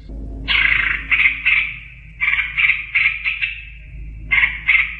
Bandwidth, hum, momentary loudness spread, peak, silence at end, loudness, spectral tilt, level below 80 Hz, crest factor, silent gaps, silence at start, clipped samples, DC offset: 7.2 kHz; none; 20 LU; 0 dBFS; 0 s; -16 LUFS; -4 dB/octave; -34 dBFS; 18 dB; none; 0 s; under 0.1%; under 0.1%